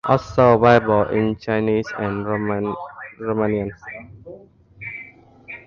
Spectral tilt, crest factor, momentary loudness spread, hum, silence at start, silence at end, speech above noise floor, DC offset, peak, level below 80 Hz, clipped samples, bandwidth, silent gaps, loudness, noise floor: -8 dB/octave; 20 dB; 22 LU; none; 0.05 s; 0.1 s; 26 dB; under 0.1%; 0 dBFS; -48 dBFS; under 0.1%; 7.2 kHz; none; -19 LUFS; -44 dBFS